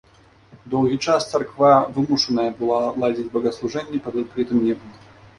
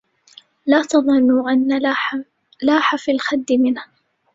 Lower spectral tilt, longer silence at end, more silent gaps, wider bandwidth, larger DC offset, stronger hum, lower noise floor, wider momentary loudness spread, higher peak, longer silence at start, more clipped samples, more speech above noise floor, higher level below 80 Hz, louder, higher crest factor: first, -5.5 dB/octave vs -3.5 dB/octave; about the same, 0.45 s vs 0.5 s; neither; first, 11.5 kHz vs 7.8 kHz; neither; neither; about the same, -51 dBFS vs -49 dBFS; about the same, 11 LU vs 9 LU; about the same, -2 dBFS vs -2 dBFS; about the same, 0.55 s vs 0.65 s; neither; about the same, 31 dB vs 32 dB; first, -56 dBFS vs -62 dBFS; second, -21 LUFS vs -17 LUFS; about the same, 20 dB vs 16 dB